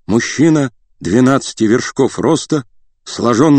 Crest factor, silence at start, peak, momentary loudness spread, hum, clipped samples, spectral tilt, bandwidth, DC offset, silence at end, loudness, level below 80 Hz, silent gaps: 14 dB; 0.1 s; 0 dBFS; 8 LU; none; 0.2%; -5.5 dB/octave; 9 kHz; under 0.1%; 0 s; -14 LUFS; -48 dBFS; none